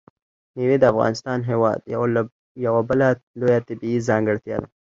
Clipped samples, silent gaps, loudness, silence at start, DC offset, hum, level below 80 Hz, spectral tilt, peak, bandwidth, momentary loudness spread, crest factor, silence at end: under 0.1%; 2.32-2.55 s, 3.23-3.34 s; -21 LUFS; 0.55 s; under 0.1%; none; -54 dBFS; -7.5 dB/octave; -2 dBFS; 7.8 kHz; 9 LU; 18 dB; 0.3 s